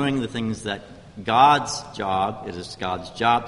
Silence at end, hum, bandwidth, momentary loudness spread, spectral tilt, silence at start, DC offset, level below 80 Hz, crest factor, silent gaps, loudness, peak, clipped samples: 0 s; none; 11.5 kHz; 17 LU; -4.5 dB/octave; 0 s; under 0.1%; -52 dBFS; 18 dB; none; -22 LUFS; -4 dBFS; under 0.1%